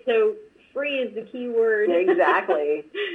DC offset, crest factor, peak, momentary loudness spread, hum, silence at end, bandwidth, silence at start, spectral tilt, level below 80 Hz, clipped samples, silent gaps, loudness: under 0.1%; 16 dB; -8 dBFS; 12 LU; none; 0 s; 4.6 kHz; 0.05 s; -5.5 dB/octave; -76 dBFS; under 0.1%; none; -22 LUFS